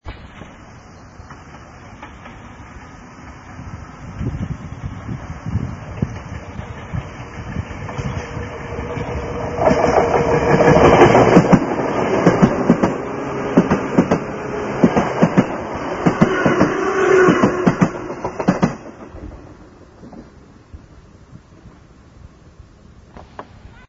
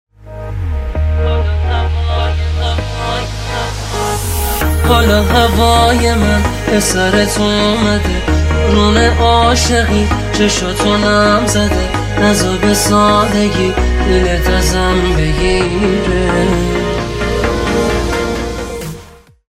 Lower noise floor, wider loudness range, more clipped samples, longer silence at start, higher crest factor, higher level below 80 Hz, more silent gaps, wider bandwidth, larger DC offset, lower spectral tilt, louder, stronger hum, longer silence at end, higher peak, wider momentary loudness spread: first, -44 dBFS vs -38 dBFS; first, 19 LU vs 5 LU; neither; second, 0.05 s vs 0.2 s; first, 18 dB vs 12 dB; second, -38 dBFS vs -20 dBFS; neither; second, 7.8 kHz vs 16.5 kHz; neither; first, -7 dB/octave vs -5 dB/octave; second, -17 LUFS vs -13 LUFS; neither; second, 0.2 s vs 0.45 s; about the same, 0 dBFS vs 0 dBFS; first, 25 LU vs 9 LU